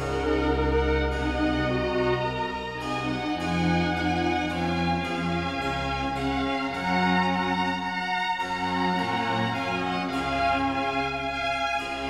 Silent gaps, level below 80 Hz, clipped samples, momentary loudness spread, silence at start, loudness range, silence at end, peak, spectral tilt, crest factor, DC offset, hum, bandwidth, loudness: none; -38 dBFS; under 0.1%; 4 LU; 0 s; 1 LU; 0 s; -12 dBFS; -6 dB/octave; 14 dB; 0.1%; none; 13 kHz; -26 LUFS